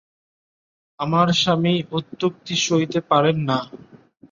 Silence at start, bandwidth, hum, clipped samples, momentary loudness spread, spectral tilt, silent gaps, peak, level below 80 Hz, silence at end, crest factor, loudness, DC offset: 1 s; 7.6 kHz; none; under 0.1%; 8 LU; -5 dB/octave; none; -4 dBFS; -60 dBFS; 0.35 s; 18 dB; -20 LUFS; under 0.1%